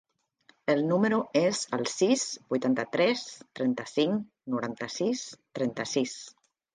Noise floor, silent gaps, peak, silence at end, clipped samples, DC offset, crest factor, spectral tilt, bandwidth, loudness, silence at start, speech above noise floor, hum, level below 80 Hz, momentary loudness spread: -65 dBFS; none; -12 dBFS; 0.45 s; under 0.1%; under 0.1%; 18 dB; -4.5 dB/octave; 10 kHz; -29 LUFS; 0.65 s; 37 dB; none; -74 dBFS; 9 LU